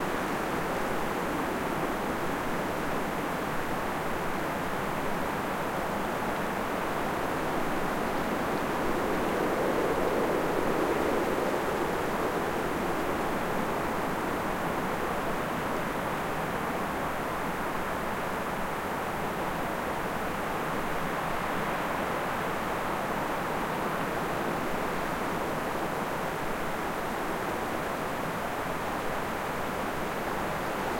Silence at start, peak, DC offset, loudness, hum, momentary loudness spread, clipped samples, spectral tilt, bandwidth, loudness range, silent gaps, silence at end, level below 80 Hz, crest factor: 0 s; -16 dBFS; under 0.1%; -31 LUFS; none; 4 LU; under 0.1%; -5 dB/octave; 16.5 kHz; 3 LU; none; 0 s; -48 dBFS; 14 dB